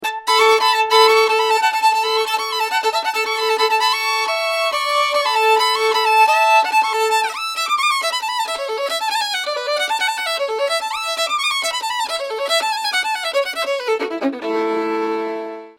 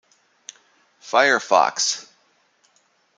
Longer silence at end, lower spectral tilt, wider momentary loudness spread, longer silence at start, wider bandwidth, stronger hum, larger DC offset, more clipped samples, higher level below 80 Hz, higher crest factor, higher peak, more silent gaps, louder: second, 0.1 s vs 1.15 s; about the same, 0.5 dB/octave vs -0.5 dB/octave; second, 8 LU vs 25 LU; second, 0 s vs 1.05 s; first, 17 kHz vs 10 kHz; neither; neither; neither; first, -68 dBFS vs -80 dBFS; about the same, 18 dB vs 22 dB; about the same, 0 dBFS vs -2 dBFS; neither; about the same, -17 LUFS vs -19 LUFS